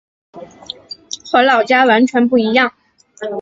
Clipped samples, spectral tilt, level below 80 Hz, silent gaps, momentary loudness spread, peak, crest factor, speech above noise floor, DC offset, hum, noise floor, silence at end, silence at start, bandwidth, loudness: under 0.1%; -4 dB/octave; -60 dBFS; none; 18 LU; 0 dBFS; 14 dB; 22 dB; under 0.1%; none; -34 dBFS; 0 s; 0.35 s; 7.8 kHz; -13 LUFS